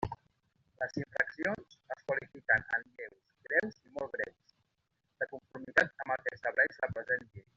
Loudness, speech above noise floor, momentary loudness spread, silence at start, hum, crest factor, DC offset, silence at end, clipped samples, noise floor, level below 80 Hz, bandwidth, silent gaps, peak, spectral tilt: -34 LUFS; 46 dB; 14 LU; 0 s; none; 26 dB; under 0.1%; 0.15 s; under 0.1%; -82 dBFS; -64 dBFS; 7.6 kHz; none; -12 dBFS; -3.5 dB/octave